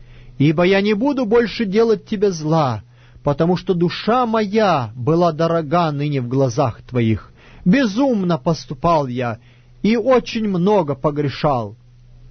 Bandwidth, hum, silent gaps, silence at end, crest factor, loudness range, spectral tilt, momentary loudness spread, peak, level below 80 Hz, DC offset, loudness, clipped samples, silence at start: 6.6 kHz; none; none; 0.05 s; 14 dB; 1 LU; -7 dB/octave; 7 LU; -4 dBFS; -44 dBFS; under 0.1%; -18 LUFS; under 0.1%; 0 s